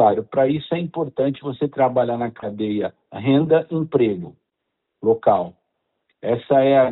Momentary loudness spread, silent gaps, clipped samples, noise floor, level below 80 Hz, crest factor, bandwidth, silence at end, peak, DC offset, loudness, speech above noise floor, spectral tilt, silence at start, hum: 10 LU; none; under 0.1%; -78 dBFS; -60 dBFS; 16 dB; 4.1 kHz; 0 s; -4 dBFS; under 0.1%; -20 LUFS; 59 dB; -12 dB/octave; 0 s; none